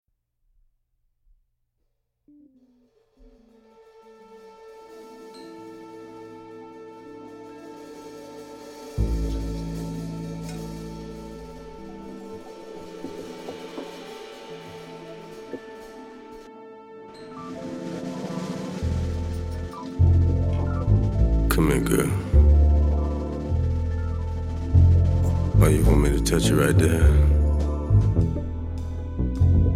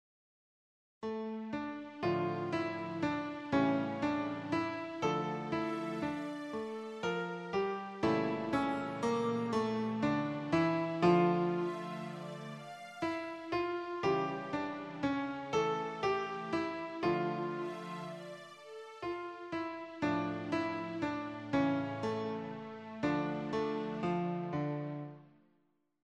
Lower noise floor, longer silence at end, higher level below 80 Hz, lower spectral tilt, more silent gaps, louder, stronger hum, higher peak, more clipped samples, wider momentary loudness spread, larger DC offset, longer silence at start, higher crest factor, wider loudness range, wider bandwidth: second, -73 dBFS vs -77 dBFS; second, 0 s vs 0.8 s; first, -28 dBFS vs -68 dBFS; about the same, -7 dB/octave vs -7 dB/octave; neither; first, -23 LUFS vs -36 LUFS; neither; first, -4 dBFS vs -16 dBFS; neither; first, 23 LU vs 10 LU; neither; first, 4.3 s vs 1 s; about the same, 20 dB vs 20 dB; first, 22 LU vs 6 LU; first, 15.5 kHz vs 11 kHz